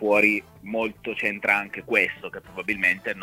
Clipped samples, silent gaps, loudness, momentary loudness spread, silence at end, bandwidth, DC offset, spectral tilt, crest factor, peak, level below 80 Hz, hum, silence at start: under 0.1%; none; -23 LUFS; 12 LU; 0 s; 16 kHz; under 0.1%; -5 dB/octave; 22 dB; -4 dBFS; -60 dBFS; none; 0 s